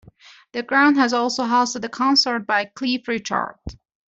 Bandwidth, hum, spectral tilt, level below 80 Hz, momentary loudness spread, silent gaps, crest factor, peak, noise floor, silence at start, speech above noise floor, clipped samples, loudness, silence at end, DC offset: 8 kHz; none; -2.5 dB/octave; -52 dBFS; 15 LU; none; 16 dB; -4 dBFS; -49 dBFS; 0.55 s; 28 dB; under 0.1%; -19 LUFS; 0.35 s; under 0.1%